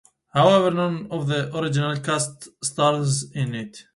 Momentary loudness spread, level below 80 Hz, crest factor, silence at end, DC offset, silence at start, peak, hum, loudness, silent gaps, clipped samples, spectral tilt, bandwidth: 12 LU; -60 dBFS; 20 dB; 0.15 s; under 0.1%; 0.35 s; -4 dBFS; none; -22 LUFS; none; under 0.1%; -5 dB/octave; 11.5 kHz